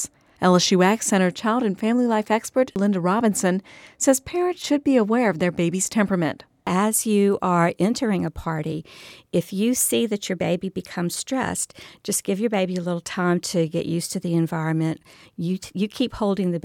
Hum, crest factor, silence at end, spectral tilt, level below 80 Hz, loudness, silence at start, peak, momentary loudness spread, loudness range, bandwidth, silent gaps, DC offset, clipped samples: none; 18 dB; 0.05 s; -5 dB/octave; -54 dBFS; -22 LUFS; 0 s; -4 dBFS; 9 LU; 4 LU; 17.5 kHz; none; under 0.1%; under 0.1%